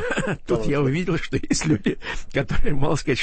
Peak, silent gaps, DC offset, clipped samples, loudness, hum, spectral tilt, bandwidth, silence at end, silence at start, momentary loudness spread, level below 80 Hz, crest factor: -8 dBFS; none; under 0.1%; under 0.1%; -24 LUFS; none; -5.5 dB/octave; 8.8 kHz; 0 s; 0 s; 5 LU; -30 dBFS; 12 dB